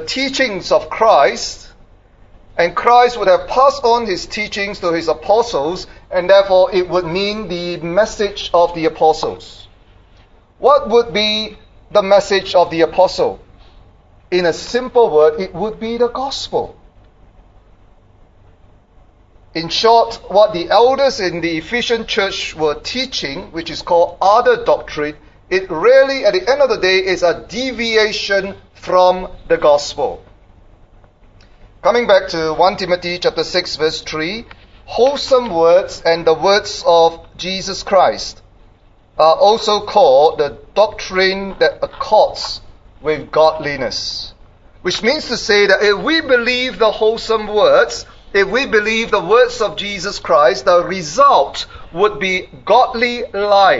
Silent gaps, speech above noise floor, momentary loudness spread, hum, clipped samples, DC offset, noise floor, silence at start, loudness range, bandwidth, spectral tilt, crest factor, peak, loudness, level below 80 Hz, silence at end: none; 33 dB; 11 LU; none; under 0.1%; under 0.1%; -48 dBFS; 0 s; 4 LU; 7.8 kHz; -3.5 dB/octave; 16 dB; 0 dBFS; -14 LUFS; -42 dBFS; 0 s